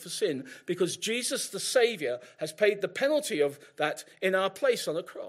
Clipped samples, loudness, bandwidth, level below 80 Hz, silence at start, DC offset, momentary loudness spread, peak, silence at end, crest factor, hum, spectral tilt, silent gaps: under 0.1%; -29 LUFS; 16 kHz; -82 dBFS; 0 s; under 0.1%; 8 LU; -10 dBFS; 0 s; 18 dB; none; -3 dB/octave; none